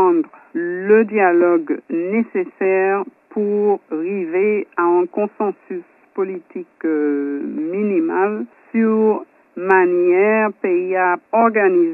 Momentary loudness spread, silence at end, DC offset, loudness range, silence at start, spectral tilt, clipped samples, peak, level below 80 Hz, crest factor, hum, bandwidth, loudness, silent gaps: 11 LU; 0 s; under 0.1%; 5 LU; 0 s; -10.5 dB/octave; under 0.1%; 0 dBFS; -78 dBFS; 18 dB; none; 2.9 kHz; -18 LUFS; none